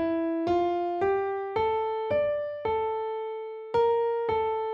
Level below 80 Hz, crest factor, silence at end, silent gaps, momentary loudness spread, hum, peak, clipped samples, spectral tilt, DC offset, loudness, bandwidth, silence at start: -60 dBFS; 12 dB; 0 s; none; 6 LU; none; -16 dBFS; under 0.1%; -7.5 dB/octave; under 0.1%; -28 LUFS; 6.8 kHz; 0 s